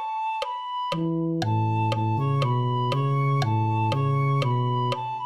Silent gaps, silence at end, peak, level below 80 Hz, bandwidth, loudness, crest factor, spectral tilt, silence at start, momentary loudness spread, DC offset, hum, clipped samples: none; 0 s; -12 dBFS; -60 dBFS; 9.2 kHz; -25 LUFS; 12 dB; -7.5 dB/octave; 0 s; 5 LU; 0.3%; none; under 0.1%